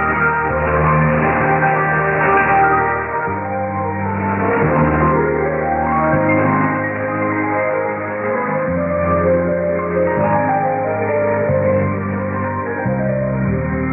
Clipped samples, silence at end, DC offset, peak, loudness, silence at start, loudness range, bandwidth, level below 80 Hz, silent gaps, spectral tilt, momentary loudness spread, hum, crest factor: under 0.1%; 0 s; under 0.1%; -2 dBFS; -16 LUFS; 0 s; 3 LU; 3 kHz; -36 dBFS; none; -13.5 dB/octave; 6 LU; none; 14 dB